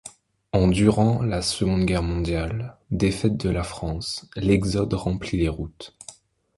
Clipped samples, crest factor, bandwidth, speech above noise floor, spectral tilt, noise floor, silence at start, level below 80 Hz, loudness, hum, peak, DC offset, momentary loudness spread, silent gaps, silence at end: under 0.1%; 20 dB; 11.5 kHz; 25 dB; -6 dB/octave; -48 dBFS; 0.05 s; -36 dBFS; -24 LUFS; none; -4 dBFS; under 0.1%; 15 LU; none; 0.45 s